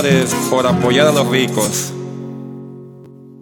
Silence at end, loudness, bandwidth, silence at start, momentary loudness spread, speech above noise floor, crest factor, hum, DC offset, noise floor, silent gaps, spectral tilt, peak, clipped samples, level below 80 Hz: 0 s; -15 LUFS; 18 kHz; 0 s; 20 LU; 24 dB; 16 dB; none; under 0.1%; -38 dBFS; none; -4.5 dB/octave; 0 dBFS; under 0.1%; -54 dBFS